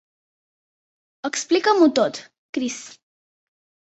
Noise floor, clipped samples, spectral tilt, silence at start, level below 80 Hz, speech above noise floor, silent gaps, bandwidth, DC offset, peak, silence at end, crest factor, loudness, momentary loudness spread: under -90 dBFS; under 0.1%; -3 dB/octave; 1.25 s; -72 dBFS; over 70 dB; 2.38-2.53 s; 8.2 kHz; under 0.1%; -4 dBFS; 1.1 s; 20 dB; -21 LUFS; 18 LU